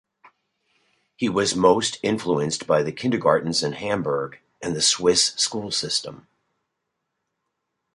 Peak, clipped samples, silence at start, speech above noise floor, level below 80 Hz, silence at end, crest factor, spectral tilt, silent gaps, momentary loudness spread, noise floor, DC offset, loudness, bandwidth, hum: -4 dBFS; under 0.1%; 1.2 s; 57 dB; -58 dBFS; 1.8 s; 20 dB; -3 dB/octave; none; 9 LU; -79 dBFS; under 0.1%; -22 LUFS; 11.5 kHz; none